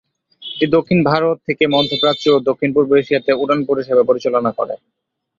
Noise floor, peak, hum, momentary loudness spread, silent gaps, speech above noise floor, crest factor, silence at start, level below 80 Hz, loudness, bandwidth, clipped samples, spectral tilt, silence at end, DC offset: -35 dBFS; 0 dBFS; none; 8 LU; none; 20 dB; 16 dB; 0.4 s; -54 dBFS; -16 LUFS; 7.6 kHz; under 0.1%; -6.5 dB/octave; 0.65 s; under 0.1%